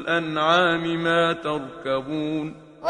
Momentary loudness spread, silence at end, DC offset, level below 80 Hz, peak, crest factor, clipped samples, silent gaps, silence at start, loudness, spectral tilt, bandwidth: 10 LU; 0 s; under 0.1%; -58 dBFS; -4 dBFS; 18 dB; under 0.1%; none; 0 s; -23 LUFS; -5.5 dB/octave; 9.8 kHz